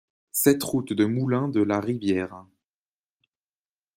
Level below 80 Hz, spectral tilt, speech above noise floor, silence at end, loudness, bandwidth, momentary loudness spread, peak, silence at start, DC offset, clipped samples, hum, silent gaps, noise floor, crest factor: -66 dBFS; -5.5 dB/octave; over 66 dB; 1.55 s; -24 LUFS; 16 kHz; 7 LU; -6 dBFS; 0.35 s; under 0.1%; under 0.1%; none; none; under -90 dBFS; 22 dB